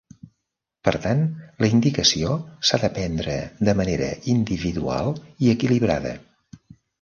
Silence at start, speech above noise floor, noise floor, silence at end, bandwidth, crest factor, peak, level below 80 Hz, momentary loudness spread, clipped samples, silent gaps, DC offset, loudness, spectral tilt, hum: 0.85 s; 59 dB; -80 dBFS; 0.45 s; 7.2 kHz; 20 dB; -2 dBFS; -44 dBFS; 8 LU; under 0.1%; none; under 0.1%; -22 LUFS; -5 dB/octave; none